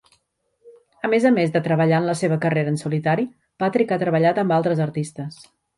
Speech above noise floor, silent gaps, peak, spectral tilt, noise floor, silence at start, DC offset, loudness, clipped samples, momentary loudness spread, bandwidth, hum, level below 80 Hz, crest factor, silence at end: 48 dB; none; -6 dBFS; -7 dB/octave; -68 dBFS; 0.65 s; under 0.1%; -21 LUFS; under 0.1%; 11 LU; 11.5 kHz; none; -64 dBFS; 16 dB; 0.45 s